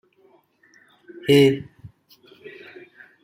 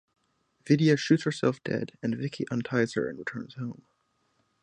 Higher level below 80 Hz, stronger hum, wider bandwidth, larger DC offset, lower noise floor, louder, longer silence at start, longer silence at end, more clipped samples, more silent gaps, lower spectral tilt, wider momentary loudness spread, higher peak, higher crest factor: about the same, -64 dBFS vs -68 dBFS; neither; first, 15.5 kHz vs 10 kHz; neither; second, -59 dBFS vs -72 dBFS; first, -19 LUFS vs -28 LUFS; first, 1.25 s vs 0.65 s; first, 1.35 s vs 0.9 s; neither; neither; about the same, -6 dB/octave vs -6.5 dB/octave; first, 27 LU vs 14 LU; first, -4 dBFS vs -10 dBFS; about the same, 20 dB vs 20 dB